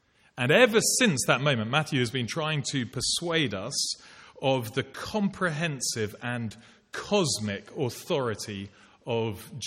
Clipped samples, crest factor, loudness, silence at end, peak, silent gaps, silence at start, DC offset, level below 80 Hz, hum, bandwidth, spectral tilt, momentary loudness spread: under 0.1%; 22 dB; -27 LUFS; 0 s; -6 dBFS; none; 0.35 s; under 0.1%; -62 dBFS; none; 16 kHz; -3.5 dB/octave; 13 LU